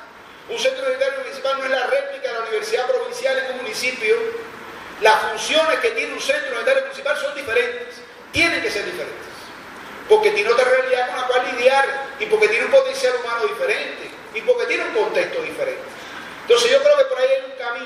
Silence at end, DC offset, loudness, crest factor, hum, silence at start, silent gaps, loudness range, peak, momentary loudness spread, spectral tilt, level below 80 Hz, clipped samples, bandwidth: 0 s; under 0.1%; -19 LUFS; 18 dB; none; 0 s; none; 4 LU; -2 dBFS; 16 LU; -2 dB/octave; -60 dBFS; under 0.1%; 14.5 kHz